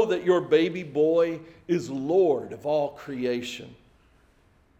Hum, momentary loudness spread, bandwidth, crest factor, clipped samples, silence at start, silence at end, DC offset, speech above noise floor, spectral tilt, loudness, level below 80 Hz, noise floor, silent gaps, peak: none; 10 LU; 14 kHz; 16 dB; under 0.1%; 0 s; 1.05 s; under 0.1%; 36 dB; -6 dB/octave; -25 LUFS; -64 dBFS; -61 dBFS; none; -8 dBFS